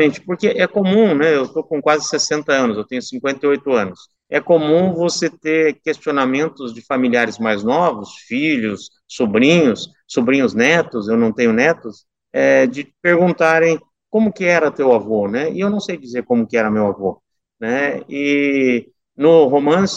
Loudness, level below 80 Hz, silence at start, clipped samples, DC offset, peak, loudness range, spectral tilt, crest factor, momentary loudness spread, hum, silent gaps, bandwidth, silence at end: -16 LUFS; -60 dBFS; 0 s; under 0.1%; under 0.1%; 0 dBFS; 3 LU; -5 dB/octave; 16 dB; 10 LU; none; none; 8.2 kHz; 0 s